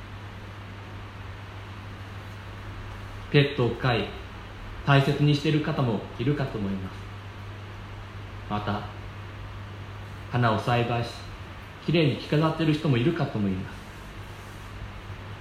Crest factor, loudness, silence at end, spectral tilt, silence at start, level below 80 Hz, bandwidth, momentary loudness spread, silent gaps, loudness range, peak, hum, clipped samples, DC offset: 22 dB; -26 LUFS; 0 s; -7 dB/octave; 0 s; -46 dBFS; 13 kHz; 18 LU; none; 10 LU; -6 dBFS; none; under 0.1%; under 0.1%